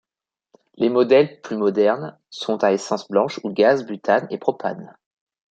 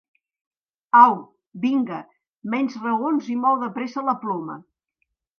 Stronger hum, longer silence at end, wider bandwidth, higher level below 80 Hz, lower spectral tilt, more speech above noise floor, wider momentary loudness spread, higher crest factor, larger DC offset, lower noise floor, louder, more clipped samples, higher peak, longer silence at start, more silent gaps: neither; second, 0.65 s vs 0.8 s; first, 8.8 kHz vs 6.6 kHz; first, -72 dBFS vs -80 dBFS; about the same, -5.5 dB/octave vs -6.5 dB/octave; first, 69 dB vs 55 dB; second, 12 LU vs 18 LU; about the same, 18 dB vs 22 dB; neither; first, -89 dBFS vs -76 dBFS; about the same, -20 LUFS vs -21 LUFS; neither; about the same, -2 dBFS vs 0 dBFS; second, 0.8 s vs 0.95 s; second, none vs 2.30-2.34 s